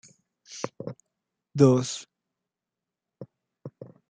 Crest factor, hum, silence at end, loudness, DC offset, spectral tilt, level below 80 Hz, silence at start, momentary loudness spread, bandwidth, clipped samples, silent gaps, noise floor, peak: 24 dB; none; 0.25 s; -25 LUFS; under 0.1%; -6.5 dB/octave; -72 dBFS; 0.5 s; 28 LU; 9.4 kHz; under 0.1%; none; -88 dBFS; -6 dBFS